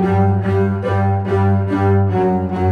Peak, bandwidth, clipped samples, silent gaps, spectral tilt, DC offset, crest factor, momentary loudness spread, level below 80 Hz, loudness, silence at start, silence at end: -4 dBFS; 4.7 kHz; under 0.1%; none; -10 dB/octave; under 0.1%; 10 dB; 3 LU; -44 dBFS; -16 LUFS; 0 s; 0 s